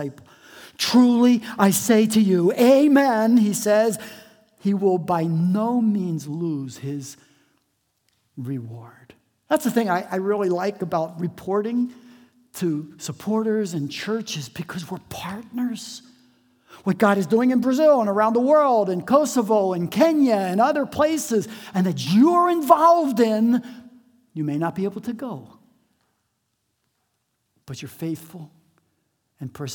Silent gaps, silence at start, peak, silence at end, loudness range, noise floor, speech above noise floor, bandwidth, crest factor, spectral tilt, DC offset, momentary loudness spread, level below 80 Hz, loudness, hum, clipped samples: none; 0 s; 0 dBFS; 0 s; 14 LU; -74 dBFS; 53 dB; 19.5 kHz; 20 dB; -5.5 dB/octave; under 0.1%; 17 LU; -68 dBFS; -20 LUFS; none; under 0.1%